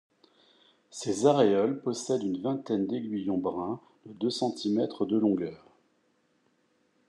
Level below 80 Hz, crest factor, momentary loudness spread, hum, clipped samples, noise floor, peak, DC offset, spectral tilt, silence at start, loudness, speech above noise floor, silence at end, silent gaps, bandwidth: -78 dBFS; 20 dB; 12 LU; none; under 0.1%; -71 dBFS; -10 dBFS; under 0.1%; -6 dB/octave; 0.95 s; -29 LUFS; 43 dB; 1.5 s; none; 11 kHz